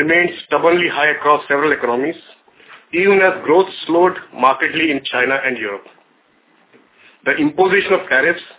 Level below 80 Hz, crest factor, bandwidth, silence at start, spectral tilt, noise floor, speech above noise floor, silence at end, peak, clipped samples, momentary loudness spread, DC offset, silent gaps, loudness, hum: -60 dBFS; 16 dB; 4 kHz; 0 s; -8 dB/octave; -56 dBFS; 40 dB; 0.1 s; 0 dBFS; under 0.1%; 8 LU; under 0.1%; none; -15 LUFS; none